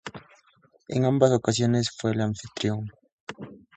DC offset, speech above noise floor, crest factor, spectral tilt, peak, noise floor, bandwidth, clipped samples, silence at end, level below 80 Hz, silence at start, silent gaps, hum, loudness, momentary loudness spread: under 0.1%; 38 dB; 22 dB; -6 dB/octave; -6 dBFS; -62 dBFS; 9.2 kHz; under 0.1%; 0.2 s; -58 dBFS; 0.05 s; 3.12-3.27 s; none; -25 LUFS; 21 LU